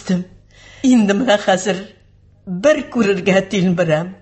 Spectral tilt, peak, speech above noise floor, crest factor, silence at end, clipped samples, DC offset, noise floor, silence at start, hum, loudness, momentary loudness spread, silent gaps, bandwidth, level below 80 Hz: -5.5 dB/octave; -2 dBFS; 34 dB; 16 dB; 0.1 s; under 0.1%; under 0.1%; -49 dBFS; 0 s; 50 Hz at -45 dBFS; -16 LUFS; 8 LU; none; 8.6 kHz; -50 dBFS